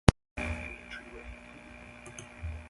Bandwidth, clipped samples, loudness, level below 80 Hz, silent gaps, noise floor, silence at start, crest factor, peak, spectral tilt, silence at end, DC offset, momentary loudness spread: 11.5 kHz; under 0.1%; -38 LUFS; -40 dBFS; 0.31-0.36 s; -50 dBFS; 0.05 s; 34 dB; 0 dBFS; -6 dB/octave; 0 s; under 0.1%; 12 LU